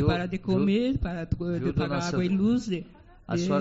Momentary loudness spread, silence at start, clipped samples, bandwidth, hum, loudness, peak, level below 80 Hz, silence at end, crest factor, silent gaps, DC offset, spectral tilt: 7 LU; 0 s; under 0.1%; 8 kHz; none; -27 LUFS; -10 dBFS; -42 dBFS; 0 s; 16 dB; none; under 0.1%; -6.5 dB/octave